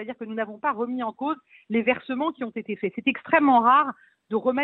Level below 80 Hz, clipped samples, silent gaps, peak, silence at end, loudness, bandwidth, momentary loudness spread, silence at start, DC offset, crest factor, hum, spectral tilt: -70 dBFS; under 0.1%; none; -6 dBFS; 0 s; -24 LUFS; 4.2 kHz; 14 LU; 0 s; under 0.1%; 18 dB; none; -8.5 dB/octave